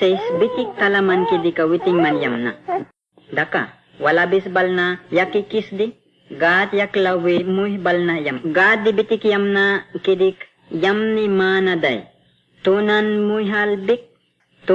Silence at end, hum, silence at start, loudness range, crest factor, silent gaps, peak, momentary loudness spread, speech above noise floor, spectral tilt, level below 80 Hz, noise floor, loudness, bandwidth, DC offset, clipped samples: 0 s; none; 0 s; 2 LU; 14 dB; none; -4 dBFS; 9 LU; 42 dB; -7 dB/octave; -64 dBFS; -60 dBFS; -18 LUFS; 7.4 kHz; under 0.1%; under 0.1%